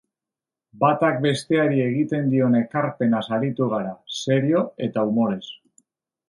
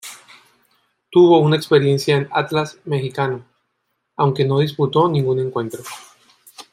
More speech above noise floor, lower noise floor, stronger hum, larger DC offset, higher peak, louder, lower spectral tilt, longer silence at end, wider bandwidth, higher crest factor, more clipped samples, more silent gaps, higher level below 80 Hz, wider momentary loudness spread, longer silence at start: first, 68 dB vs 56 dB; first, -89 dBFS vs -72 dBFS; neither; neither; about the same, -4 dBFS vs -2 dBFS; second, -22 LUFS vs -17 LUFS; about the same, -6.5 dB/octave vs -6.5 dB/octave; first, 0.75 s vs 0.1 s; second, 11.5 kHz vs 16 kHz; about the same, 18 dB vs 16 dB; neither; neither; about the same, -66 dBFS vs -62 dBFS; second, 7 LU vs 18 LU; first, 0.75 s vs 0.05 s